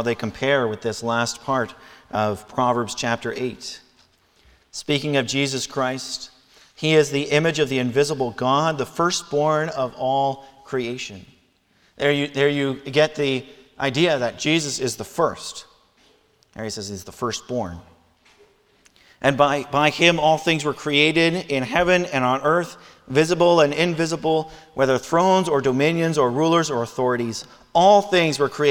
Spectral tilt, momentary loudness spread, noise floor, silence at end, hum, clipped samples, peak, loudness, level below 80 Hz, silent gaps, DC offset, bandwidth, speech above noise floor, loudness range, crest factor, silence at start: -4.5 dB/octave; 13 LU; -61 dBFS; 0 s; none; under 0.1%; 0 dBFS; -21 LUFS; -56 dBFS; none; under 0.1%; 18 kHz; 40 dB; 7 LU; 22 dB; 0 s